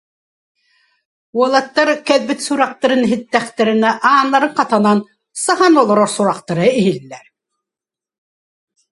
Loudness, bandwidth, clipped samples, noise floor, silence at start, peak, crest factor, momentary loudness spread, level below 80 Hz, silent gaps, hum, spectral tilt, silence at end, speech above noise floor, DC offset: -14 LUFS; 11.5 kHz; under 0.1%; -88 dBFS; 1.35 s; 0 dBFS; 16 dB; 7 LU; -64 dBFS; none; none; -4.5 dB/octave; 1.75 s; 74 dB; under 0.1%